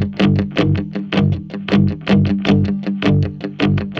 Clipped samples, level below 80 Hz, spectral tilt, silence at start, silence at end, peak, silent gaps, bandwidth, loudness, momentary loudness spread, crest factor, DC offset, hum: under 0.1%; -38 dBFS; -8 dB/octave; 0 s; 0 s; -2 dBFS; none; 7 kHz; -17 LUFS; 5 LU; 14 dB; under 0.1%; none